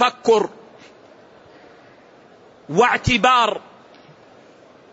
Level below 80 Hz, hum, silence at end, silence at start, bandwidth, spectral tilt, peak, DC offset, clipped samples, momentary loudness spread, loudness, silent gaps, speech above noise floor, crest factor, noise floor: -46 dBFS; none; 1.35 s; 0 s; 8 kHz; -4 dB/octave; -4 dBFS; under 0.1%; under 0.1%; 11 LU; -17 LUFS; none; 31 dB; 18 dB; -48 dBFS